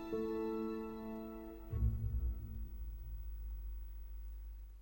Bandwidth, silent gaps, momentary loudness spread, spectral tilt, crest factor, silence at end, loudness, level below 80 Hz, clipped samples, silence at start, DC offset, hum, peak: 16.5 kHz; none; 12 LU; -9.5 dB/octave; 18 dB; 0 s; -44 LUFS; -44 dBFS; under 0.1%; 0 s; under 0.1%; none; -24 dBFS